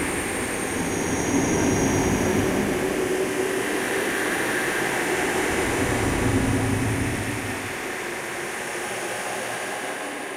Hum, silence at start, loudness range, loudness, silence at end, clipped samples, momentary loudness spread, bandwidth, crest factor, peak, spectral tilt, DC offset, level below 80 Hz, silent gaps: none; 0 s; 4 LU; -24 LUFS; 0 s; under 0.1%; 7 LU; 16 kHz; 16 dB; -8 dBFS; -4 dB/octave; under 0.1%; -42 dBFS; none